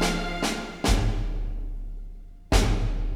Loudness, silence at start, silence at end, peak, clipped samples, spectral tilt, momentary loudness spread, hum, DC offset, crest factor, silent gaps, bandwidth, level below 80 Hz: -27 LUFS; 0 s; 0 s; -6 dBFS; under 0.1%; -4.5 dB/octave; 17 LU; none; under 0.1%; 18 dB; none; 15 kHz; -28 dBFS